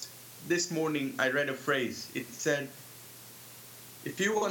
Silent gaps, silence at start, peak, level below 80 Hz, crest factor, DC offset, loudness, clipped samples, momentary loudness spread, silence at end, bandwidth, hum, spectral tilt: none; 0 s; -14 dBFS; -80 dBFS; 20 dB; under 0.1%; -32 LUFS; under 0.1%; 18 LU; 0 s; 18 kHz; none; -3.5 dB/octave